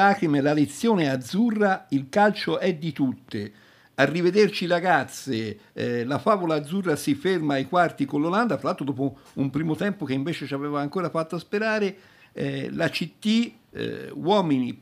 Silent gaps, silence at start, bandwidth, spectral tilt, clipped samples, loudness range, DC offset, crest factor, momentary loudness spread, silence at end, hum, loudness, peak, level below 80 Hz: none; 0 s; 15.5 kHz; -6 dB/octave; under 0.1%; 4 LU; under 0.1%; 20 dB; 9 LU; 0.05 s; none; -25 LUFS; -4 dBFS; -68 dBFS